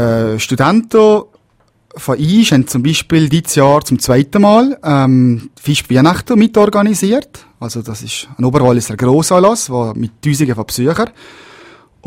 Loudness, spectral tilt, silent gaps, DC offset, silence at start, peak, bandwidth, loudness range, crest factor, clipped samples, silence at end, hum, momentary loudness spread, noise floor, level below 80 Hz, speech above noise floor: -12 LUFS; -5.5 dB/octave; none; under 0.1%; 0 s; 0 dBFS; 16.5 kHz; 3 LU; 12 dB; 0.1%; 0.95 s; none; 10 LU; -55 dBFS; -42 dBFS; 44 dB